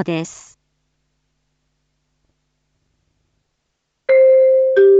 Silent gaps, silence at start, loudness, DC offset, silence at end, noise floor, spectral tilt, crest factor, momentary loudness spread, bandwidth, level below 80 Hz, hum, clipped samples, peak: none; 0 s; -13 LUFS; under 0.1%; 0 s; -72 dBFS; -6 dB/octave; 14 dB; 18 LU; 7.8 kHz; -68 dBFS; none; under 0.1%; -4 dBFS